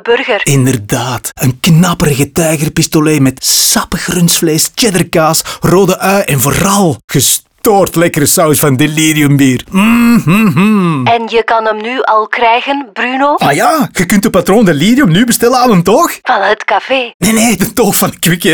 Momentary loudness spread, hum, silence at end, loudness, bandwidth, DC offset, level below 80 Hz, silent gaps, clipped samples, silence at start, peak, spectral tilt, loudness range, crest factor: 4 LU; none; 0 s; -9 LUFS; over 20 kHz; under 0.1%; -36 dBFS; 7.04-7.08 s, 17.14-17.20 s; under 0.1%; 0.05 s; 0 dBFS; -4.5 dB/octave; 2 LU; 8 dB